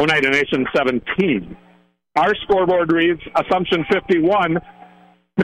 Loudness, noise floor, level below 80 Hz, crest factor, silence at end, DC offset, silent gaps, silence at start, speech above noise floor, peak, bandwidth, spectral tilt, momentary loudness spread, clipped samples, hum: -18 LUFS; -54 dBFS; -48 dBFS; 12 dB; 0 s; under 0.1%; none; 0 s; 37 dB; -6 dBFS; 11 kHz; -6 dB/octave; 7 LU; under 0.1%; none